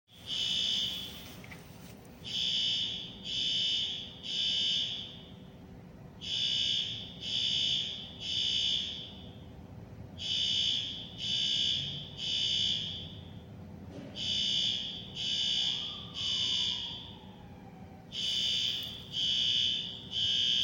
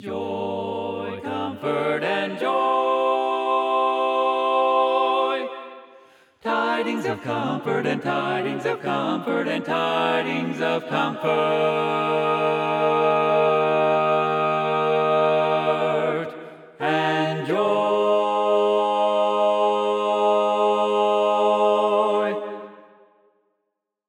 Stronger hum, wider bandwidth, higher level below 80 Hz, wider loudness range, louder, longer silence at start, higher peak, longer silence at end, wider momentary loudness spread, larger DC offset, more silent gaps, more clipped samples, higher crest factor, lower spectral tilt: neither; first, 16.5 kHz vs 11.5 kHz; first, -62 dBFS vs -80 dBFS; about the same, 2 LU vs 4 LU; second, -30 LUFS vs -22 LUFS; about the same, 0.1 s vs 0 s; second, -18 dBFS vs -8 dBFS; second, 0 s vs 1.3 s; first, 21 LU vs 8 LU; neither; neither; neither; about the same, 16 dB vs 14 dB; second, -1.5 dB/octave vs -6 dB/octave